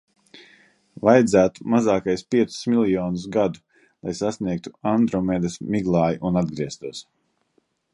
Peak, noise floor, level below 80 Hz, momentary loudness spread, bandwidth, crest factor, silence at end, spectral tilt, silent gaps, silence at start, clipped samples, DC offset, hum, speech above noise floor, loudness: -2 dBFS; -68 dBFS; -52 dBFS; 12 LU; 11.5 kHz; 20 dB; 0.9 s; -6.5 dB/octave; none; 0.35 s; under 0.1%; under 0.1%; none; 47 dB; -22 LUFS